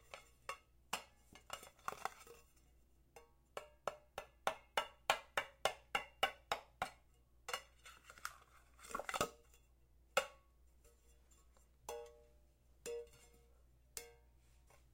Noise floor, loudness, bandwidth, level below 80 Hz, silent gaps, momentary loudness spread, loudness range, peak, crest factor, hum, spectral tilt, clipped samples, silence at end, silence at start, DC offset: -70 dBFS; -45 LUFS; 16.5 kHz; -70 dBFS; none; 20 LU; 13 LU; -16 dBFS; 32 dB; none; -1 dB/octave; under 0.1%; 0.15 s; 0.05 s; under 0.1%